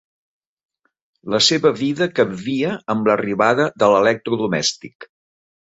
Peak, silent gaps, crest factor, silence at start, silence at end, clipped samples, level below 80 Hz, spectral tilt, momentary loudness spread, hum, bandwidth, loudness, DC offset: -2 dBFS; 4.95-5.00 s; 18 dB; 1.25 s; 0.7 s; under 0.1%; -60 dBFS; -4 dB/octave; 8 LU; none; 8 kHz; -18 LUFS; under 0.1%